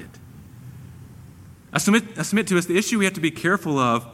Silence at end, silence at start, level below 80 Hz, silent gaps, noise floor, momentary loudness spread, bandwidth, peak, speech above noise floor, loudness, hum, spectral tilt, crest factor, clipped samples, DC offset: 0 s; 0 s; -56 dBFS; none; -45 dBFS; 23 LU; 16 kHz; -4 dBFS; 24 dB; -21 LUFS; none; -4.5 dB/octave; 20 dB; under 0.1%; under 0.1%